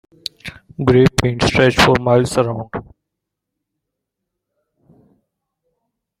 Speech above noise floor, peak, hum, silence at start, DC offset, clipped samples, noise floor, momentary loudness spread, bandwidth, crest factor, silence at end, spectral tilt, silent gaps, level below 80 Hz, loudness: 65 dB; 0 dBFS; none; 0.45 s; under 0.1%; under 0.1%; -80 dBFS; 19 LU; 16 kHz; 18 dB; 3.4 s; -5.5 dB/octave; none; -40 dBFS; -15 LUFS